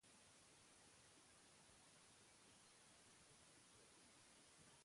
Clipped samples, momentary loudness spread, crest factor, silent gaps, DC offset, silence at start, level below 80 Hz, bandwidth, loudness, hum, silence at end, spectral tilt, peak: under 0.1%; 0 LU; 14 dB; none; under 0.1%; 0 s; -90 dBFS; 11.5 kHz; -68 LUFS; none; 0 s; -2 dB/octave; -56 dBFS